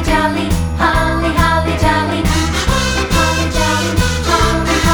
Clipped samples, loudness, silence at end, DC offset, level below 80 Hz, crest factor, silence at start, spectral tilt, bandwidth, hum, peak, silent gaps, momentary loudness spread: under 0.1%; -14 LUFS; 0 s; under 0.1%; -20 dBFS; 14 dB; 0 s; -4.5 dB/octave; over 20 kHz; none; 0 dBFS; none; 2 LU